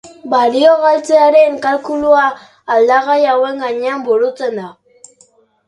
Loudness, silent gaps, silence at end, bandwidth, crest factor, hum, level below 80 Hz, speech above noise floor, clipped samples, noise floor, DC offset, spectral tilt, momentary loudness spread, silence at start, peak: -12 LUFS; none; 0.95 s; 11 kHz; 14 dB; none; -58 dBFS; 39 dB; under 0.1%; -51 dBFS; under 0.1%; -4 dB/octave; 10 LU; 0.05 s; 0 dBFS